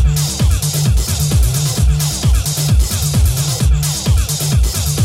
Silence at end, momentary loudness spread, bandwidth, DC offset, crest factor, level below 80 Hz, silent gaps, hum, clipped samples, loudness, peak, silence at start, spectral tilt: 0 s; 1 LU; 16.5 kHz; under 0.1%; 10 dB; -16 dBFS; none; none; under 0.1%; -15 LUFS; -2 dBFS; 0 s; -4.5 dB/octave